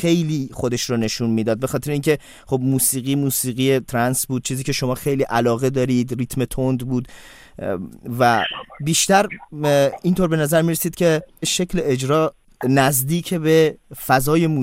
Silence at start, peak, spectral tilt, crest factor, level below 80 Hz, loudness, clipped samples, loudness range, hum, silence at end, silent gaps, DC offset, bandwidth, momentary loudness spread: 0 s; -2 dBFS; -4.5 dB/octave; 18 dB; -44 dBFS; -19 LUFS; under 0.1%; 3 LU; none; 0 s; none; under 0.1%; 16.5 kHz; 9 LU